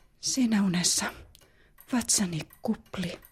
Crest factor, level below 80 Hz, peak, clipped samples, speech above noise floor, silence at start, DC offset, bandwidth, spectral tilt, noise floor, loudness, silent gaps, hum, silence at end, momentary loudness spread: 18 dB; -58 dBFS; -10 dBFS; under 0.1%; 30 dB; 0.2 s; under 0.1%; 15.5 kHz; -3 dB/octave; -58 dBFS; -28 LUFS; none; none; 0.15 s; 11 LU